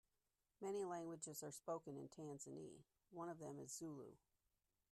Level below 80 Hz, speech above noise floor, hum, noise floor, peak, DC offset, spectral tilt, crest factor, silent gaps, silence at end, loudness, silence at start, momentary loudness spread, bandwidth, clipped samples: -88 dBFS; over 38 dB; none; under -90 dBFS; -36 dBFS; under 0.1%; -5 dB/octave; 18 dB; none; 0.75 s; -53 LUFS; 0.6 s; 11 LU; 13.5 kHz; under 0.1%